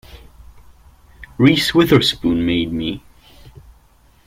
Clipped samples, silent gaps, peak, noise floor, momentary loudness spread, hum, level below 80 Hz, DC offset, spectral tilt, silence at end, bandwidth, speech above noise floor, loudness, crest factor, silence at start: under 0.1%; none; -2 dBFS; -52 dBFS; 14 LU; none; -42 dBFS; under 0.1%; -5.5 dB/octave; 1.3 s; 16.5 kHz; 36 dB; -16 LUFS; 18 dB; 0.15 s